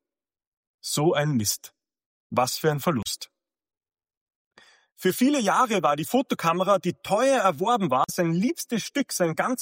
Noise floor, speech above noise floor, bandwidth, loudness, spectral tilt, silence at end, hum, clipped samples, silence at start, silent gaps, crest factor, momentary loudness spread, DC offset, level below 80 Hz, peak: -54 dBFS; 30 dB; 16.5 kHz; -24 LUFS; -4.5 dB/octave; 0 s; none; under 0.1%; 0.85 s; 2.06-2.30 s, 4.17-4.26 s, 4.36-4.51 s; 18 dB; 8 LU; under 0.1%; -66 dBFS; -8 dBFS